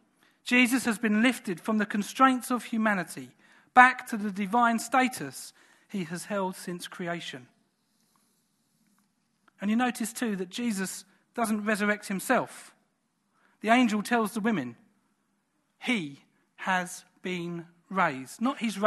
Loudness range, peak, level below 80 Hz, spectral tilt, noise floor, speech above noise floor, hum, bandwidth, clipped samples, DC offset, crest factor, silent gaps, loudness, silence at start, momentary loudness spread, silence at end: 12 LU; -4 dBFS; -78 dBFS; -4 dB/octave; -75 dBFS; 47 dB; none; 13 kHz; under 0.1%; under 0.1%; 26 dB; none; -27 LUFS; 0.45 s; 16 LU; 0 s